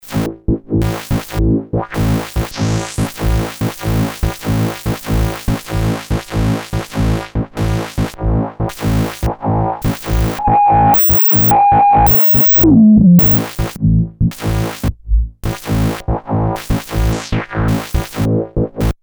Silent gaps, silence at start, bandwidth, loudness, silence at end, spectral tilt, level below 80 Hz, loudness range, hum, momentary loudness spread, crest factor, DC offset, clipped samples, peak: none; 0.05 s; over 20 kHz; -14 LUFS; 0.1 s; -7 dB/octave; -24 dBFS; 10 LU; none; 13 LU; 12 dB; under 0.1%; under 0.1%; -2 dBFS